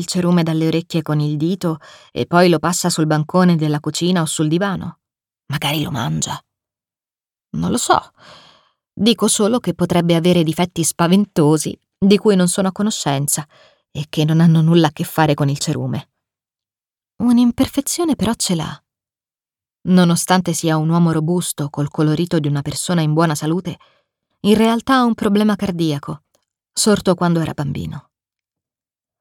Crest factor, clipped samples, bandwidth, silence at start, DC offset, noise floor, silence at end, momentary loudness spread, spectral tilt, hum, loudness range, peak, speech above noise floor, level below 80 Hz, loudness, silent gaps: 16 dB; under 0.1%; 18 kHz; 0 s; under 0.1%; under -90 dBFS; 1.2 s; 11 LU; -5.5 dB/octave; none; 5 LU; 0 dBFS; over 74 dB; -50 dBFS; -17 LUFS; none